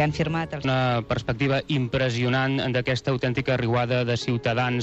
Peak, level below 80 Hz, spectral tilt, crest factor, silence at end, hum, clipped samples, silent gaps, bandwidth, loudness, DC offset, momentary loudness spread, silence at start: -10 dBFS; -48 dBFS; -6.5 dB/octave; 14 dB; 0 s; none; under 0.1%; none; 8 kHz; -24 LUFS; under 0.1%; 3 LU; 0 s